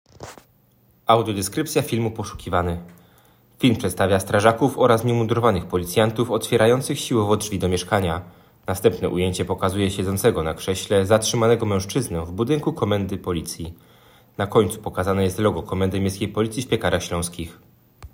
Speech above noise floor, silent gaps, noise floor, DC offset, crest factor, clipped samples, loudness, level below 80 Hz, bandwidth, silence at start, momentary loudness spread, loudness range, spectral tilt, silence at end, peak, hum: 37 dB; none; -58 dBFS; under 0.1%; 20 dB; under 0.1%; -21 LUFS; -50 dBFS; 16.5 kHz; 0.2 s; 11 LU; 5 LU; -5.5 dB/octave; 0.05 s; -2 dBFS; none